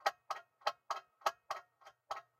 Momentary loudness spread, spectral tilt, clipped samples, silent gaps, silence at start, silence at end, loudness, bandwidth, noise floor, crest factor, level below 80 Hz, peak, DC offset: 9 LU; 0.5 dB/octave; under 0.1%; none; 0.05 s; 0.2 s; -43 LUFS; 16 kHz; -64 dBFS; 26 dB; -88 dBFS; -18 dBFS; under 0.1%